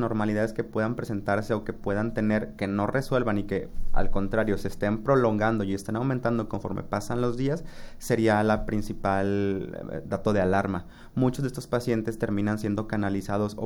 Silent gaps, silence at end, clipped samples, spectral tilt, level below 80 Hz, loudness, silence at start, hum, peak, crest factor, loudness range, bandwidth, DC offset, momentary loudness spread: none; 0 s; under 0.1%; -7 dB/octave; -38 dBFS; -27 LUFS; 0 s; none; -10 dBFS; 16 dB; 1 LU; 16 kHz; under 0.1%; 8 LU